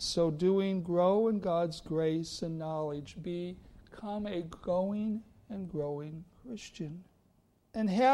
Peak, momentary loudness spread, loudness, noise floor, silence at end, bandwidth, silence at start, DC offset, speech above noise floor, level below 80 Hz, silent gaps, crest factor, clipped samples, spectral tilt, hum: -16 dBFS; 17 LU; -33 LUFS; -69 dBFS; 0 s; 12.5 kHz; 0 s; under 0.1%; 37 dB; -60 dBFS; none; 16 dB; under 0.1%; -6 dB/octave; none